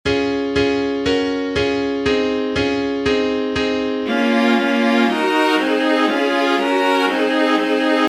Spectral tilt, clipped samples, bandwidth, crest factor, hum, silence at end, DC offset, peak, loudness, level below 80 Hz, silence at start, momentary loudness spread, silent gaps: -4.5 dB/octave; under 0.1%; 14.5 kHz; 12 dB; none; 0 s; under 0.1%; -4 dBFS; -17 LUFS; -44 dBFS; 0.05 s; 4 LU; none